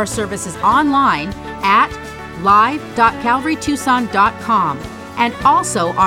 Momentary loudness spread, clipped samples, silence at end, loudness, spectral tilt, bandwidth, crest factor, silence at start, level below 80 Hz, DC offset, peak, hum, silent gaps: 9 LU; under 0.1%; 0 s; -15 LUFS; -4 dB/octave; 16.5 kHz; 14 dB; 0 s; -42 dBFS; under 0.1%; 0 dBFS; none; none